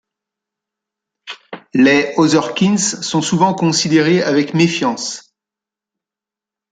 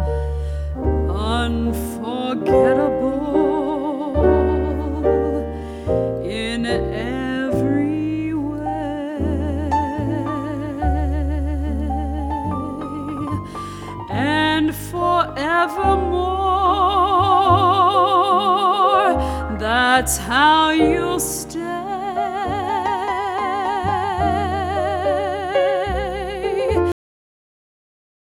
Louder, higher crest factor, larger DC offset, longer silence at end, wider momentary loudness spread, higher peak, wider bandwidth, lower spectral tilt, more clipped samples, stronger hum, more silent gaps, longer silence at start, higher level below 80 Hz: first, -14 LUFS vs -19 LUFS; about the same, 16 dB vs 18 dB; neither; first, 1.5 s vs 1.3 s; first, 18 LU vs 10 LU; about the same, 0 dBFS vs 0 dBFS; second, 9.6 kHz vs 18 kHz; about the same, -4.5 dB/octave vs -5.5 dB/octave; neither; neither; neither; first, 1.25 s vs 0 s; second, -60 dBFS vs -30 dBFS